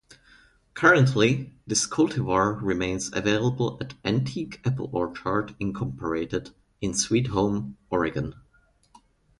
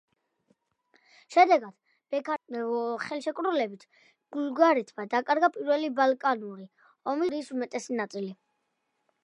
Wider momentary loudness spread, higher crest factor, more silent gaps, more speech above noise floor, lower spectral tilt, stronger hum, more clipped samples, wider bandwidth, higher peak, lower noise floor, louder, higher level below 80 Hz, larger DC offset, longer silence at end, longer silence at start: about the same, 11 LU vs 13 LU; about the same, 22 dB vs 22 dB; neither; second, 38 dB vs 51 dB; about the same, -5 dB/octave vs -4.5 dB/octave; neither; neither; about the same, 11.5 kHz vs 11 kHz; first, -4 dBFS vs -8 dBFS; second, -62 dBFS vs -78 dBFS; first, -25 LUFS vs -28 LUFS; first, -50 dBFS vs -84 dBFS; neither; about the same, 1 s vs 0.9 s; second, 0.75 s vs 1.3 s